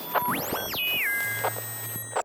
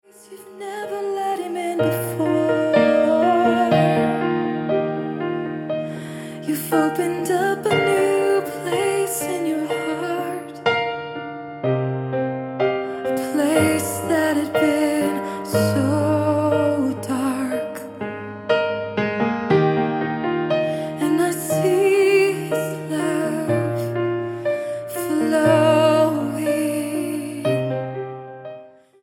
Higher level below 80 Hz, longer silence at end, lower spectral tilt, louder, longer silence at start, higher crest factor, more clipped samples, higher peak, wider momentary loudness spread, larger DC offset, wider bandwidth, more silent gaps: about the same, -62 dBFS vs -62 dBFS; second, 0 s vs 0.35 s; second, -2 dB/octave vs -5.5 dB/octave; second, -27 LUFS vs -21 LUFS; second, 0 s vs 0.3 s; about the same, 16 dB vs 16 dB; neither; second, -12 dBFS vs -4 dBFS; second, 7 LU vs 11 LU; neither; about the same, 18 kHz vs 17 kHz; neither